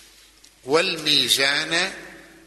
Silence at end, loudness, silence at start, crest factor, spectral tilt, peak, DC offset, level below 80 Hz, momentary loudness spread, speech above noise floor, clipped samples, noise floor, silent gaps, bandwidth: 0.25 s; -19 LUFS; 0.65 s; 20 dB; -1.5 dB/octave; -4 dBFS; under 0.1%; -62 dBFS; 8 LU; 31 dB; under 0.1%; -52 dBFS; none; 12.5 kHz